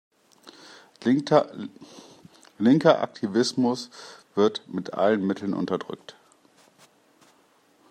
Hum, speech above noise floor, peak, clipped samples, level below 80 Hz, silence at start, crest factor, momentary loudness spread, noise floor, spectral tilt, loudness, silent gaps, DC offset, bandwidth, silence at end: none; 38 dB; -4 dBFS; under 0.1%; -74 dBFS; 0.45 s; 22 dB; 20 LU; -61 dBFS; -6 dB/octave; -24 LUFS; none; under 0.1%; 10 kHz; 1.8 s